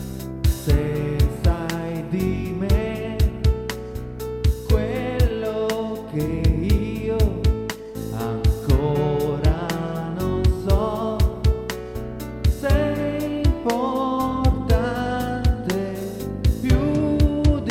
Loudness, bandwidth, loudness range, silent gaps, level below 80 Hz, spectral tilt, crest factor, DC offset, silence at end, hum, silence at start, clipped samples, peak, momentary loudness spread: -23 LUFS; 16.5 kHz; 2 LU; none; -26 dBFS; -7 dB/octave; 16 dB; under 0.1%; 0 s; none; 0 s; under 0.1%; -4 dBFS; 8 LU